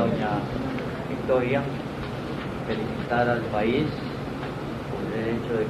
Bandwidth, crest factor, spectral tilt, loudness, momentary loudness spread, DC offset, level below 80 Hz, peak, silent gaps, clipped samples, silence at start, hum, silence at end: 14 kHz; 18 dB; -7.5 dB/octave; -27 LUFS; 8 LU; under 0.1%; -46 dBFS; -10 dBFS; none; under 0.1%; 0 s; none; 0 s